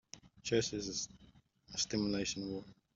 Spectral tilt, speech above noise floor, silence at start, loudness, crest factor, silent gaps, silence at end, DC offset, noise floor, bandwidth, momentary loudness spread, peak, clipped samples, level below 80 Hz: -3.5 dB/octave; 26 dB; 0.15 s; -38 LUFS; 20 dB; none; 0.2 s; under 0.1%; -63 dBFS; 7.8 kHz; 11 LU; -20 dBFS; under 0.1%; -64 dBFS